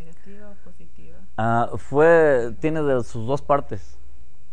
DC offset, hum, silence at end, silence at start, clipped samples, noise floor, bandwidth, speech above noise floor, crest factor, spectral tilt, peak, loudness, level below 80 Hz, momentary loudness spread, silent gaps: 6%; none; 0.7 s; 0.3 s; under 0.1%; -49 dBFS; 9.8 kHz; 29 dB; 18 dB; -7.5 dB/octave; -4 dBFS; -20 LUFS; -48 dBFS; 15 LU; none